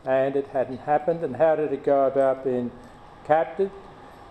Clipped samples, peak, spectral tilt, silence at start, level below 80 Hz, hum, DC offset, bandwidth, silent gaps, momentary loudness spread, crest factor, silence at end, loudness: under 0.1%; -6 dBFS; -8 dB/octave; 0.05 s; -58 dBFS; none; under 0.1%; 8.8 kHz; none; 8 LU; 18 dB; 0 s; -24 LUFS